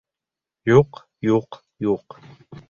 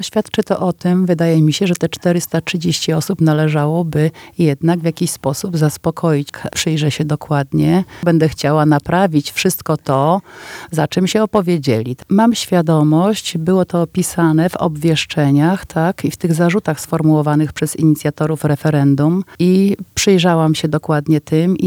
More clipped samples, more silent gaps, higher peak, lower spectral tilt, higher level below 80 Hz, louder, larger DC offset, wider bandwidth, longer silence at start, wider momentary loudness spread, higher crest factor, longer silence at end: neither; neither; about the same, -2 dBFS vs 0 dBFS; first, -8 dB/octave vs -6 dB/octave; about the same, -52 dBFS vs -48 dBFS; second, -21 LUFS vs -15 LUFS; neither; second, 7 kHz vs 17 kHz; first, 0.65 s vs 0 s; first, 11 LU vs 5 LU; first, 20 dB vs 14 dB; about the same, 0.1 s vs 0 s